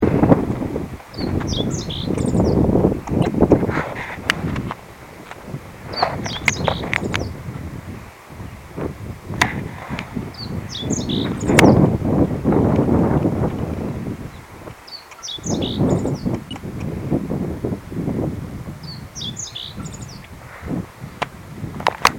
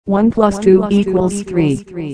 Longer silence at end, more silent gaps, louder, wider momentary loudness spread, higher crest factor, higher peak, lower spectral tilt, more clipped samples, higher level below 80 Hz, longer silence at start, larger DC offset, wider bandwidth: about the same, 0 s vs 0 s; neither; second, -21 LUFS vs -14 LUFS; first, 18 LU vs 6 LU; first, 20 dB vs 14 dB; about the same, 0 dBFS vs 0 dBFS; second, -5.5 dB/octave vs -7 dB/octave; neither; about the same, -36 dBFS vs -40 dBFS; about the same, 0 s vs 0.05 s; neither; first, 17 kHz vs 10.5 kHz